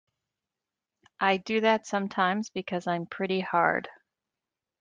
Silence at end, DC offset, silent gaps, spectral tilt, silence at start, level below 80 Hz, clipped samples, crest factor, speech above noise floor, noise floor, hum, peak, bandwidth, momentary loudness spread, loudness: 0.9 s; under 0.1%; none; -5 dB/octave; 1.2 s; -74 dBFS; under 0.1%; 22 dB; 62 dB; -89 dBFS; none; -8 dBFS; 9.4 kHz; 8 LU; -28 LUFS